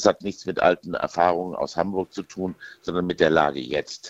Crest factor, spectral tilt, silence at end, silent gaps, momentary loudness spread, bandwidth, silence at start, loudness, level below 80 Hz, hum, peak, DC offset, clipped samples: 22 dB; -5 dB/octave; 0 s; none; 12 LU; 8.2 kHz; 0 s; -24 LUFS; -56 dBFS; none; -2 dBFS; under 0.1%; under 0.1%